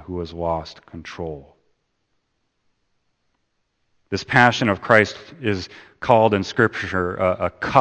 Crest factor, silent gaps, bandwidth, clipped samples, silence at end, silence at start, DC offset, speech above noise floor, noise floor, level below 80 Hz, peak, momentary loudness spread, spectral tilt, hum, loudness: 22 dB; none; 8.8 kHz; under 0.1%; 0 s; 0 s; under 0.1%; 51 dB; -71 dBFS; -50 dBFS; 0 dBFS; 17 LU; -5.5 dB/octave; none; -20 LUFS